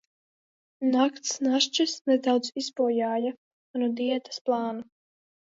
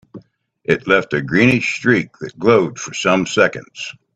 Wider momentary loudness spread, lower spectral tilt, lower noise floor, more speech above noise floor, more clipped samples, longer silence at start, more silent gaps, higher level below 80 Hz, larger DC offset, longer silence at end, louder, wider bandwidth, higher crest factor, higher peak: second, 8 LU vs 15 LU; second, -2.5 dB/octave vs -5 dB/octave; first, under -90 dBFS vs -47 dBFS; first, over 64 dB vs 31 dB; neither; first, 0.8 s vs 0.15 s; first, 2.01-2.05 s, 3.38-3.74 s, 4.41-4.45 s vs none; second, -82 dBFS vs -52 dBFS; neither; first, 0.65 s vs 0.25 s; second, -27 LUFS vs -16 LUFS; second, 7.8 kHz vs 9.6 kHz; about the same, 18 dB vs 18 dB; second, -10 dBFS vs 0 dBFS